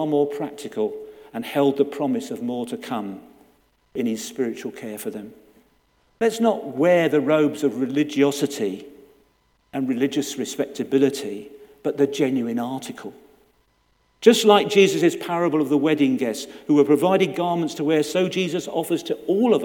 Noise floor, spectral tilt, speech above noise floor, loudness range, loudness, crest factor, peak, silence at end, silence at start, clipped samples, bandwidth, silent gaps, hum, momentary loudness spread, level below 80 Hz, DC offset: -64 dBFS; -5 dB/octave; 43 dB; 8 LU; -22 LUFS; 22 dB; 0 dBFS; 0 s; 0 s; under 0.1%; 18.5 kHz; none; none; 15 LU; -68 dBFS; under 0.1%